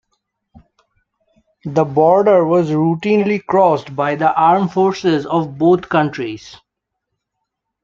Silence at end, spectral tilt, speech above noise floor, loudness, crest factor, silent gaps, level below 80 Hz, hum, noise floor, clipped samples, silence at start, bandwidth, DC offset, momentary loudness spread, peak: 1.3 s; -7.5 dB/octave; 63 dB; -15 LUFS; 14 dB; none; -58 dBFS; none; -77 dBFS; under 0.1%; 1.65 s; 7.4 kHz; under 0.1%; 9 LU; -2 dBFS